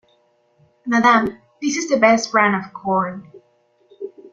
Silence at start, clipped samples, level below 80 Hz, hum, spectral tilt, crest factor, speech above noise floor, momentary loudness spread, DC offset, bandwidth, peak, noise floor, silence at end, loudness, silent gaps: 0.85 s; under 0.1%; -60 dBFS; none; -4 dB/octave; 18 dB; 43 dB; 21 LU; under 0.1%; 7.6 kHz; -2 dBFS; -60 dBFS; 0.05 s; -18 LUFS; none